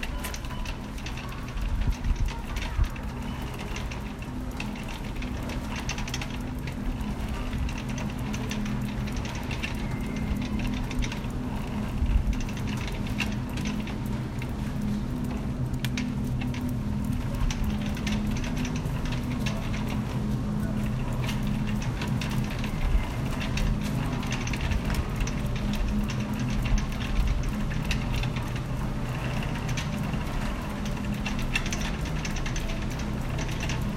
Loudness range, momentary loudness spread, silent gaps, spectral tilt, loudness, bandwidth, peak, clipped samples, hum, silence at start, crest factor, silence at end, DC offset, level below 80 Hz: 3 LU; 5 LU; none; -5.5 dB/octave; -31 LUFS; 16 kHz; -10 dBFS; under 0.1%; none; 0 s; 18 dB; 0 s; under 0.1%; -32 dBFS